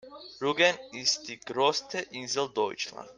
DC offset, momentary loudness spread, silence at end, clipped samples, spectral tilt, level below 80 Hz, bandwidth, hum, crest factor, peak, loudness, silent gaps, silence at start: under 0.1%; 11 LU; 0.05 s; under 0.1%; -2 dB/octave; -72 dBFS; 10.5 kHz; none; 20 dB; -10 dBFS; -29 LUFS; none; 0.05 s